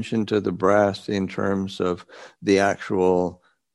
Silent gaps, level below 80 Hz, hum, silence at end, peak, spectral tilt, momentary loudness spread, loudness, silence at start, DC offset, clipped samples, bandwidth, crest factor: none; -60 dBFS; none; 0.4 s; -4 dBFS; -6 dB/octave; 7 LU; -22 LUFS; 0 s; under 0.1%; under 0.1%; 11.5 kHz; 18 dB